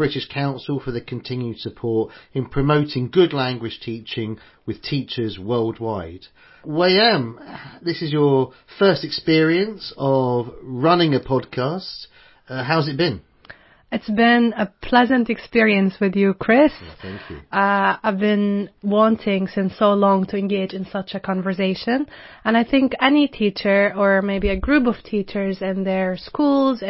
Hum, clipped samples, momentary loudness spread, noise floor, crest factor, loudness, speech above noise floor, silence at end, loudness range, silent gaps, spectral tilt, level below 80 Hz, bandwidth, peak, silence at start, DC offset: none; under 0.1%; 13 LU; -46 dBFS; 18 dB; -20 LUFS; 27 dB; 0 s; 4 LU; none; -10.5 dB/octave; -44 dBFS; 5.8 kHz; -2 dBFS; 0 s; under 0.1%